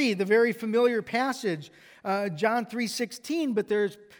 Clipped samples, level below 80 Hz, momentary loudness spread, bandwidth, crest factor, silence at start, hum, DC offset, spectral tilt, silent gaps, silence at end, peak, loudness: under 0.1%; -76 dBFS; 8 LU; over 20 kHz; 16 dB; 0 s; none; under 0.1%; -5 dB/octave; none; 0.15 s; -10 dBFS; -27 LUFS